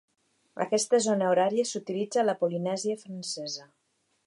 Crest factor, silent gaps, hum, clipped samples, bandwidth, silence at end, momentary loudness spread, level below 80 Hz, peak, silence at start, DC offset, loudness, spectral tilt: 16 dB; none; none; under 0.1%; 11.5 kHz; 0.6 s; 11 LU; -82 dBFS; -12 dBFS; 0.55 s; under 0.1%; -28 LUFS; -4 dB/octave